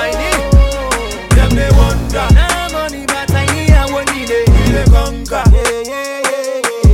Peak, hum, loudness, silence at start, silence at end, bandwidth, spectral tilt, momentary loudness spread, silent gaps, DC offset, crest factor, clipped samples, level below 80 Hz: 0 dBFS; none; -13 LUFS; 0 s; 0 s; 16 kHz; -5 dB/octave; 7 LU; none; under 0.1%; 10 dB; under 0.1%; -14 dBFS